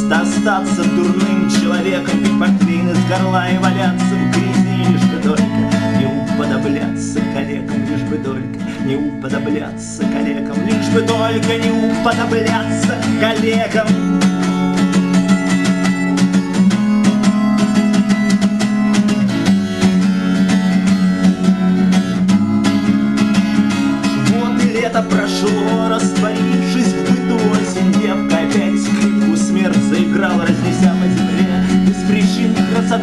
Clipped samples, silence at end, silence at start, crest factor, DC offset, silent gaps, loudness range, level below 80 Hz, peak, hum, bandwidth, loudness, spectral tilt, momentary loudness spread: under 0.1%; 0 s; 0 s; 14 dB; 0.3%; none; 4 LU; -44 dBFS; 0 dBFS; none; 12 kHz; -15 LUFS; -6 dB/octave; 5 LU